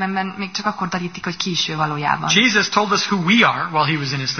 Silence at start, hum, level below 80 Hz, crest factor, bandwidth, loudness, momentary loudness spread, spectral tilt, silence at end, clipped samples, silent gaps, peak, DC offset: 0 s; none; -58 dBFS; 18 dB; 6.6 kHz; -18 LUFS; 10 LU; -3.5 dB/octave; 0 s; under 0.1%; none; -2 dBFS; 0.2%